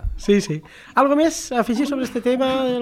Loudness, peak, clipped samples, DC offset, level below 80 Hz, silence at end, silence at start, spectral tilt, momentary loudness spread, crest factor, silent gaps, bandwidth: -20 LUFS; -4 dBFS; under 0.1%; under 0.1%; -36 dBFS; 0 s; 0 s; -5 dB/octave; 6 LU; 16 dB; none; 15.5 kHz